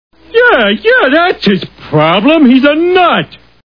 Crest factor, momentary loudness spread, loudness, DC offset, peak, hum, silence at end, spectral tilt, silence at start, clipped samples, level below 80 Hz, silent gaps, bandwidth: 8 dB; 8 LU; -8 LUFS; 0.5%; 0 dBFS; none; 0.3 s; -7.5 dB/octave; 0.35 s; 0.9%; -44 dBFS; none; 5.4 kHz